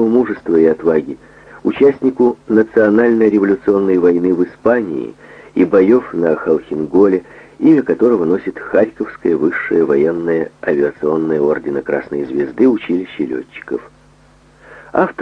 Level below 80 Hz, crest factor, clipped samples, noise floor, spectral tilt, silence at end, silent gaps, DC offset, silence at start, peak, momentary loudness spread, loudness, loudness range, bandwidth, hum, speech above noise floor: -52 dBFS; 14 dB; under 0.1%; -47 dBFS; -9 dB/octave; 0.1 s; none; under 0.1%; 0 s; 0 dBFS; 10 LU; -15 LUFS; 4 LU; 6.4 kHz; none; 33 dB